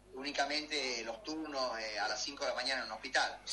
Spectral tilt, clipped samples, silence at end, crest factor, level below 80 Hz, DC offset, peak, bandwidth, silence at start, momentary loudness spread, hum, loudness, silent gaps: -1 dB/octave; under 0.1%; 0 s; 18 dB; -66 dBFS; under 0.1%; -20 dBFS; 11.5 kHz; 0.05 s; 6 LU; none; -36 LUFS; none